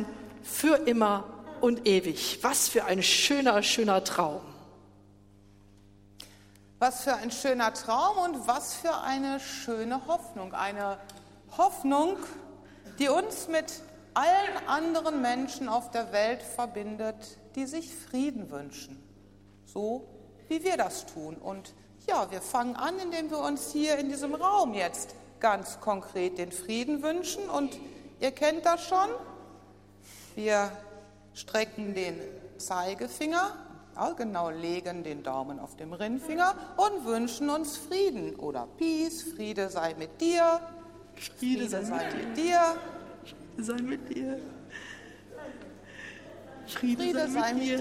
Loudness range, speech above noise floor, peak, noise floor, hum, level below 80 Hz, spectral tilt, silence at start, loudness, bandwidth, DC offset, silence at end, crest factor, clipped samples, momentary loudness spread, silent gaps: 9 LU; 27 dB; -8 dBFS; -57 dBFS; 50 Hz at -60 dBFS; -64 dBFS; -3 dB/octave; 0 s; -30 LUFS; 16 kHz; under 0.1%; 0 s; 22 dB; under 0.1%; 19 LU; none